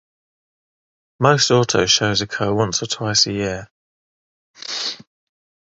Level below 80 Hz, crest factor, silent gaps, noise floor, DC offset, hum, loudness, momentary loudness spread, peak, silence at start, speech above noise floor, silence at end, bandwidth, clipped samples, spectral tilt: -50 dBFS; 22 dB; 3.71-4.54 s; under -90 dBFS; under 0.1%; none; -18 LUFS; 12 LU; 0 dBFS; 1.2 s; over 72 dB; 0.7 s; 8.2 kHz; under 0.1%; -3.5 dB/octave